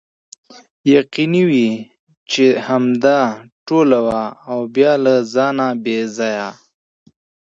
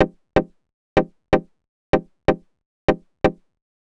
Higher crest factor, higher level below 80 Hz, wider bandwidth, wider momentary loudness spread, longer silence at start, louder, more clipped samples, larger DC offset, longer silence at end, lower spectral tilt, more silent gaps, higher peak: second, 16 dB vs 22 dB; second, -60 dBFS vs -38 dBFS; second, 7.8 kHz vs 9.2 kHz; first, 9 LU vs 2 LU; first, 0.85 s vs 0 s; first, -15 LUFS vs -23 LUFS; neither; neither; first, 1 s vs 0.5 s; second, -6 dB/octave vs -7.5 dB/octave; second, 1.99-2.07 s, 2.17-2.26 s, 3.52-3.66 s vs 0.74-0.96 s, 1.68-1.93 s, 2.66-2.88 s; about the same, 0 dBFS vs 0 dBFS